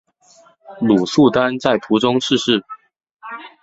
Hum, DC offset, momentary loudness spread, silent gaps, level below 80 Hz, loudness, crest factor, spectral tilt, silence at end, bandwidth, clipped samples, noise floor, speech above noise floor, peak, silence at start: none; under 0.1%; 20 LU; 3.11-3.17 s; -54 dBFS; -16 LUFS; 18 dB; -5 dB/octave; 0.15 s; 8 kHz; under 0.1%; -51 dBFS; 35 dB; 0 dBFS; 0.7 s